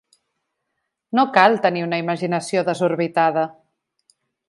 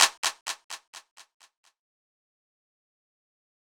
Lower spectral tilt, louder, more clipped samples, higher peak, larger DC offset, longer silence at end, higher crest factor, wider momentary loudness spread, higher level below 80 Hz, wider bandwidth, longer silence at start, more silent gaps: first, -5.5 dB/octave vs 3.5 dB/octave; first, -19 LUFS vs -29 LUFS; neither; about the same, 0 dBFS vs -2 dBFS; neither; second, 0.95 s vs 2.45 s; second, 22 dB vs 32 dB; second, 9 LU vs 22 LU; first, -74 dBFS vs -80 dBFS; second, 11.5 kHz vs over 20 kHz; first, 1.15 s vs 0 s; second, none vs 0.18-0.23 s, 0.41-0.46 s, 0.64-0.69 s, 0.87-0.93 s, 1.11-1.16 s